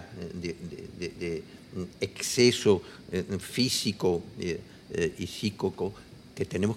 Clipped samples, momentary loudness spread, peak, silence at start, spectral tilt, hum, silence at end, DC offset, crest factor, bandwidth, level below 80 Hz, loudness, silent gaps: under 0.1%; 16 LU; -8 dBFS; 0 s; -4.5 dB/octave; none; 0 s; under 0.1%; 22 dB; 16 kHz; -60 dBFS; -30 LUFS; none